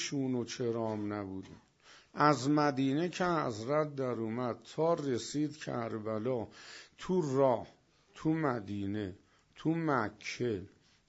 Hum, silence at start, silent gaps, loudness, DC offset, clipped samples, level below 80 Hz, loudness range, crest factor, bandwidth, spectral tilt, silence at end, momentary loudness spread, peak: none; 0 s; none; -34 LUFS; under 0.1%; under 0.1%; -70 dBFS; 3 LU; 22 dB; 8 kHz; -6 dB/octave; 0.4 s; 12 LU; -12 dBFS